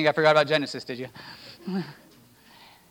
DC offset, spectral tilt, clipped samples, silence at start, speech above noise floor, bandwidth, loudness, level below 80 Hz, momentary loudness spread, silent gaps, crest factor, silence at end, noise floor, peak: under 0.1%; -5 dB/octave; under 0.1%; 0 s; 30 dB; 19 kHz; -25 LUFS; -72 dBFS; 22 LU; none; 20 dB; 1 s; -55 dBFS; -6 dBFS